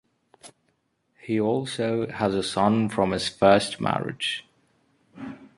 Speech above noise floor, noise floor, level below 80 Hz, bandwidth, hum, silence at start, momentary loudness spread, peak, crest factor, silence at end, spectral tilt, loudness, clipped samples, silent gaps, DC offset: 48 dB; -71 dBFS; -56 dBFS; 11.5 kHz; none; 0.45 s; 17 LU; -4 dBFS; 22 dB; 0.1 s; -5 dB/octave; -24 LUFS; under 0.1%; none; under 0.1%